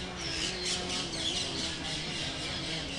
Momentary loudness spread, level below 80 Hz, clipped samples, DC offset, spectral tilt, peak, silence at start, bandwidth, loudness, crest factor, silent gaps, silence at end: 3 LU; -50 dBFS; under 0.1%; under 0.1%; -2.5 dB/octave; -18 dBFS; 0 s; 11.5 kHz; -32 LUFS; 16 dB; none; 0 s